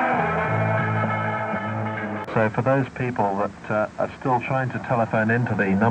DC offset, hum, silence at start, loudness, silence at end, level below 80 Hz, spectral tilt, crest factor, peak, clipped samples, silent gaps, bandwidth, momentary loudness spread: under 0.1%; none; 0 s; -23 LUFS; 0 s; -54 dBFS; -8.5 dB/octave; 16 dB; -6 dBFS; under 0.1%; none; 8.6 kHz; 6 LU